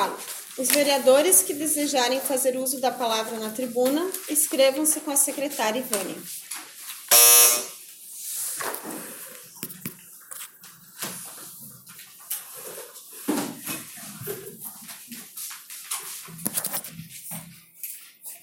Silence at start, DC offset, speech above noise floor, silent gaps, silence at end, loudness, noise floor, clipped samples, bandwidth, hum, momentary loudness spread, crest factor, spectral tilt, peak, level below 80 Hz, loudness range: 0 s; under 0.1%; 25 dB; none; 0.05 s; -21 LUFS; -48 dBFS; under 0.1%; 17 kHz; none; 21 LU; 22 dB; -1 dB/octave; -2 dBFS; -76 dBFS; 17 LU